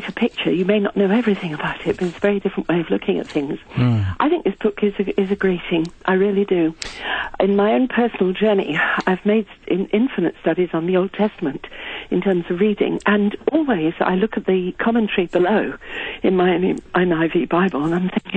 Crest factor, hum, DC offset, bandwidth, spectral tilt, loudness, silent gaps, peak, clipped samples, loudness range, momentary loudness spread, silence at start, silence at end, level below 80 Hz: 16 dB; none; under 0.1%; 9 kHz; -7.5 dB/octave; -19 LUFS; none; -2 dBFS; under 0.1%; 2 LU; 6 LU; 0 s; 0 s; -48 dBFS